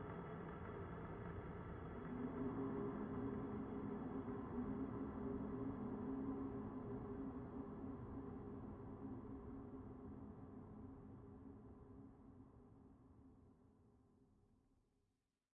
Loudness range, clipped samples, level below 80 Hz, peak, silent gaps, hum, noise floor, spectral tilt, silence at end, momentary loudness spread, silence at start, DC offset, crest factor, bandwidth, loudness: 16 LU; under 0.1%; -64 dBFS; -34 dBFS; none; none; -88 dBFS; -6.5 dB/octave; 1.25 s; 16 LU; 0 s; under 0.1%; 16 dB; 3.7 kHz; -50 LUFS